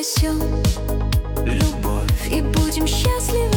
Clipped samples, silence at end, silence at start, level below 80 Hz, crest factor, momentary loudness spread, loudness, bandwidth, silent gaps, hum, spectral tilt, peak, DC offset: under 0.1%; 0 s; 0 s; -22 dBFS; 12 dB; 3 LU; -20 LUFS; over 20 kHz; none; none; -5 dB/octave; -6 dBFS; under 0.1%